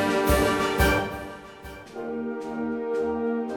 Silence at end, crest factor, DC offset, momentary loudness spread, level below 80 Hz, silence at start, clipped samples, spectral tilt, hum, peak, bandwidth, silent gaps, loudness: 0 s; 16 dB; under 0.1%; 18 LU; -36 dBFS; 0 s; under 0.1%; -5 dB/octave; none; -8 dBFS; 18 kHz; none; -25 LUFS